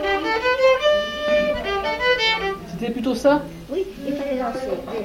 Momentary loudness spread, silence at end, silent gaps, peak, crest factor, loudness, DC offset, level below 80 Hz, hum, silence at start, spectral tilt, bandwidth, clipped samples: 10 LU; 0 s; none; -6 dBFS; 16 dB; -21 LUFS; under 0.1%; -44 dBFS; none; 0 s; -4 dB/octave; 16.5 kHz; under 0.1%